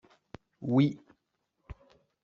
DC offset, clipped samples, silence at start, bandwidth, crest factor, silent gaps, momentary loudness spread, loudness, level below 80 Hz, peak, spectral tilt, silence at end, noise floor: under 0.1%; under 0.1%; 0.6 s; 6.8 kHz; 20 dB; none; 26 LU; -29 LUFS; -60 dBFS; -12 dBFS; -8 dB/octave; 0.5 s; -80 dBFS